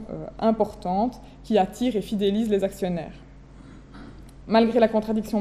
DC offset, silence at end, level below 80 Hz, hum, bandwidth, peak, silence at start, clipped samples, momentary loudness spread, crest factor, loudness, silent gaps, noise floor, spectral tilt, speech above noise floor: under 0.1%; 0 s; -48 dBFS; none; 14.5 kHz; -6 dBFS; 0 s; under 0.1%; 24 LU; 18 dB; -24 LUFS; none; -45 dBFS; -6.5 dB/octave; 22 dB